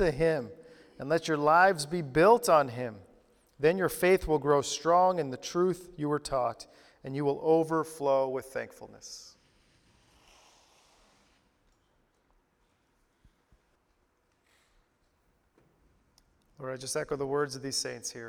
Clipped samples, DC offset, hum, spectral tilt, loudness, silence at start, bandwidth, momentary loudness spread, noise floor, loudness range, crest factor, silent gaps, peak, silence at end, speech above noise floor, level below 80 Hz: under 0.1%; under 0.1%; none; -4.5 dB/octave; -28 LUFS; 0 s; 18.5 kHz; 21 LU; -72 dBFS; 14 LU; 22 dB; none; -10 dBFS; 0 s; 44 dB; -56 dBFS